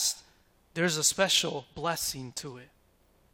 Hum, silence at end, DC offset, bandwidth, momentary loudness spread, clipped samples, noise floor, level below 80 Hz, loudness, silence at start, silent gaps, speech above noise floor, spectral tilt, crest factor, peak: none; 0.7 s; under 0.1%; 16.5 kHz; 16 LU; under 0.1%; -65 dBFS; -62 dBFS; -28 LUFS; 0 s; none; 35 dB; -2 dB/octave; 22 dB; -10 dBFS